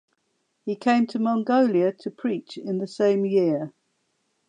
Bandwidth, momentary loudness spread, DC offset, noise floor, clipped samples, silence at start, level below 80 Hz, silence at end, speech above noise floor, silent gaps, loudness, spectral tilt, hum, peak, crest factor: 9.6 kHz; 11 LU; under 0.1%; -73 dBFS; under 0.1%; 0.65 s; -80 dBFS; 0.8 s; 50 dB; none; -24 LUFS; -7 dB/octave; none; -10 dBFS; 16 dB